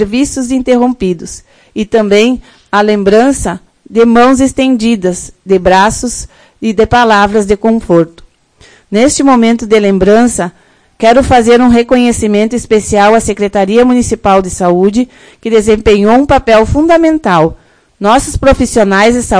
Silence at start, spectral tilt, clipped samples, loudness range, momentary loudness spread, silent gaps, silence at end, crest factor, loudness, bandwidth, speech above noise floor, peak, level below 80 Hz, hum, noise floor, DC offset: 0 s; -5 dB/octave; 3%; 2 LU; 10 LU; none; 0 s; 8 dB; -9 LUFS; 11 kHz; 35 dB; 0 dBFS; -28 dBFS; none; -43 dBFS; under 0.1%